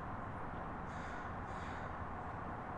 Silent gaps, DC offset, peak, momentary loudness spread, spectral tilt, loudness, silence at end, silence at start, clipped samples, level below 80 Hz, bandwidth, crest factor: none; under 0.1%; -32 dBFS; 1 LU; -7 dB/octave; -45 LUFS; 0 s; 0 s; under 0.1%; -56 dBFS; 11 kHz; 12 dB